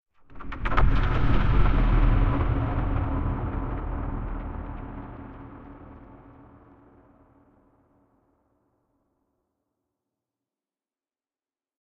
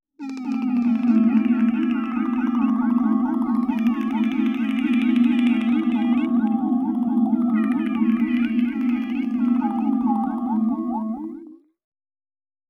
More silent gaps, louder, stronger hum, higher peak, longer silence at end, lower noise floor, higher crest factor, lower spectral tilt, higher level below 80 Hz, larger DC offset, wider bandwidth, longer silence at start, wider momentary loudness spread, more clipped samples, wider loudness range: neither; second, -27 LUFS vs -21 LUFS; neither; about the same, -6 dBFS vs -8 dBFS; first, 5.65 s vs 1.15 s; first, under -90 dBFS vs -42 dBFS; first, 22 dB vs 12 dB; about the same, -9 dB/octave vs -8 dB/octave; first, -30 dBFS vs -60 dBFS; neither; first, 4.7 kHz vs 4 kHz; about the same, 0.3 s vs 0.2 s; first, 22 LU vs 6 LU; neither; first, 21 LU vs 3 LU